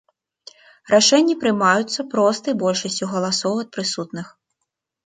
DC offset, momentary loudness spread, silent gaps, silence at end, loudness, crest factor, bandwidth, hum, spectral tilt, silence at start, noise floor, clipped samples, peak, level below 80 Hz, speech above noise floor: under 0.1%; 12 LU; none; 0.8 s; -19 LUFS; 18 dB; 9.6 kHz; none; -3.5 dB/octave; 0.9 s; -79 dBFS; under 0.1%; -2 dBFS; -68 dBFS; 59 dB